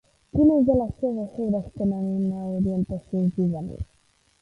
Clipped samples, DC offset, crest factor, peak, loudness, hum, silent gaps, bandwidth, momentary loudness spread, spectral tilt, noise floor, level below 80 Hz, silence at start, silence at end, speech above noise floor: under 0.1%; under 0.1%; 16 dB; -8 dBFS; -24 LUFS; none; none; 5 kHz; 11 LU; -11.5 dB/octave; -64 dBFS; -44 dBFS; 0.35 s; 0.6 s; 40 dB